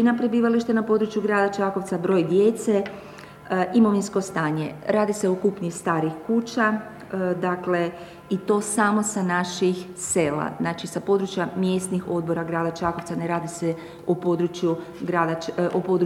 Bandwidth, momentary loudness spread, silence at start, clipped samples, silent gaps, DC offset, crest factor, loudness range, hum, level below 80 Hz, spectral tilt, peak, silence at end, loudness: 15 kHz; 8 LU; 0 s; under 0.1%; none; under 0.1%; 18 dB; 3 LU; none; -60 dBFS; -5.5 dB/octave; -6 dBFS; 0 s; -24 LUFS